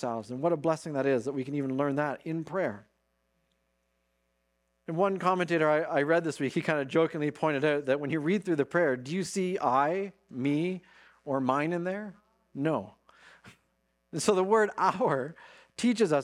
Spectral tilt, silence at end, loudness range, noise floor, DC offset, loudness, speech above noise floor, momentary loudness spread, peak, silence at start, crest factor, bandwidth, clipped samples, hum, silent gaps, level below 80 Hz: -6 dB/octave; 0 s; 6 LU; -76 dBFS; under 0.1%; -29 LUFS; 47 dB; 10 LU; -10 dBFS; 0 s; 20 dB; 13.5 kHz; under 0.1%; none; none; -74 dBFS